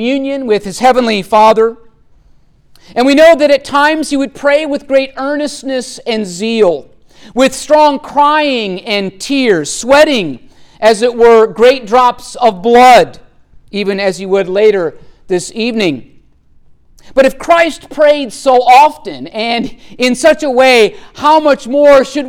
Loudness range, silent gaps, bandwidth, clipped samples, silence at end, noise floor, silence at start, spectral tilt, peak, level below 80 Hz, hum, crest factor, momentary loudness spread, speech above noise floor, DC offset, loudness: 6 LU; none; 17.5 kHz; under 0.1%; 0 s; -45 dBFS; 0 s; -3.5 dB/octave; 0 dBFS; -42 dBFS; none; 10 dB; 11 LU; 35 dB; under 0.1%; -10 LUFS